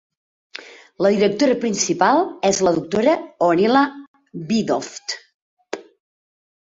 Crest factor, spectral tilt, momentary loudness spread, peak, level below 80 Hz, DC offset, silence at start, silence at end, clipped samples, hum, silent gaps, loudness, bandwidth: 18 dB; -4 dB/octave; 18 LU; -2 dBFS; -60 dBFS; under 0.1%; 0.6 s; 0.8 s; under 0.1%; none; 4.07-4.14 s, 5.34-5.57 s; -19 LUFS; 8 kHz